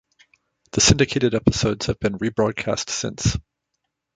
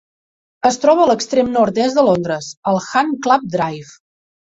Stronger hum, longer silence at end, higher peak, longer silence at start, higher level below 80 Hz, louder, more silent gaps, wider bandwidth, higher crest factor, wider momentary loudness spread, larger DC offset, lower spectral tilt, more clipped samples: neither; about the same, 0.75 s vs 0.7 s; about the same, -2 dBFS vs -2 dBFS; about the same, 0.75 s vs 0.65 s; first, -38 dBFS vs -56 dBFS; second, -21 LUFS vs -16 LUFS; second, none vs 2.57-2.63 s; first, 9.6 kHz vs 8 kHz; about the same, 20 dB vs 16 dB; about the same, 9 LU vs 9 LU; neither; about the same, -4 dB/octave vs -5 dB/octave; neither